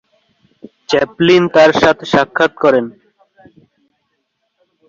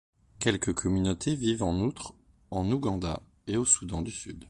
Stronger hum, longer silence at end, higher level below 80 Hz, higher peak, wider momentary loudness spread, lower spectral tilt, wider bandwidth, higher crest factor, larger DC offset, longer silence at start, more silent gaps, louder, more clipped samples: neither; first, 2 s vs 0.05 s; second, -52 dBFS vs -46 dBFS; first, 0 dBFS vs -8 dBFS; second, 8 LU vs 13 LU; about the same, -5.5 dB/octave vs -4.5 dB/octave; second, 7.6 kHz vs 11.5 kHz; second, 14 dB vs 22 dB; neither; first, 0.9 s vs 0.4 s; neither; first, -12 LUFS vs -29 LUFS; neither